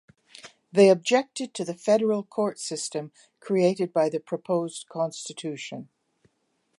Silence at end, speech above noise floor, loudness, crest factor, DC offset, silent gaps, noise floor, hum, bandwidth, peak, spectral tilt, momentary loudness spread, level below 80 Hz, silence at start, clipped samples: 0.95 s; 48 dB; -25 LUFS; 20 dB; under 0.1%; none; -73 dBFS; none; 11.5 kHz; -6 dBFS; -5 dB/octave; 17 LU; -78 dBFS; 0.45 s; under 0.1%